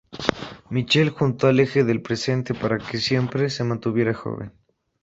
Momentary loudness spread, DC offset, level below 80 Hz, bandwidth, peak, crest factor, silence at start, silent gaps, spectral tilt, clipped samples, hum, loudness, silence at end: 10 LU; under 0.1%; -54 dBFS; 8 kHz; 0 dBFS; 22 dB; 0.1 s; none; -6 dB/octave; under 0.1%; none; -22 LUFS; 0.55 s